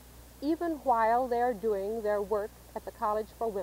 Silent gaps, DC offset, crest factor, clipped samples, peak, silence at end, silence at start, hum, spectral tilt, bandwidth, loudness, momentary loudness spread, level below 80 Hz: none; under 0.1%; 14 dB; under 0.1%; -16 dBFS; 0 s; 0 s; none; -6 dB/octave; 16 kHz; -31 LUFS; 11 LU; -56 dBFS